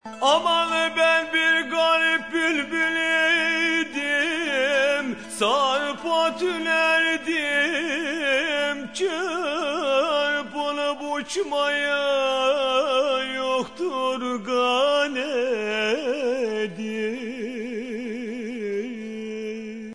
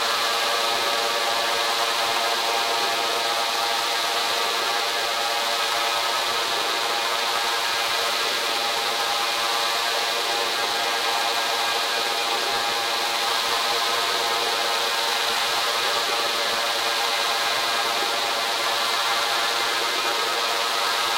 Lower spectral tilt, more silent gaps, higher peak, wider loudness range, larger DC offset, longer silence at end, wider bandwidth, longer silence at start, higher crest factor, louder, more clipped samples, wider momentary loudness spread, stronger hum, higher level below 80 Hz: first, -2.5 dB/octave vs 0.5 dB/octave; neither; about the same, -6 dBFS vs -6 dBFS; first, 6 LU vs 1 LU; first, 0.2% vs under 0.1%; about the same, 0 s vs 0 s; second, 11 kHz vs 16 kHz; about the same, 0.05 s vs 0 s; about the same, 18 dB vs 16 dB; about the same, -23 LUFS vs -21 LUFS; neither; first, 11 LU vs 1 LU; neither; about the same, -66 dBFS vs -70 dBFS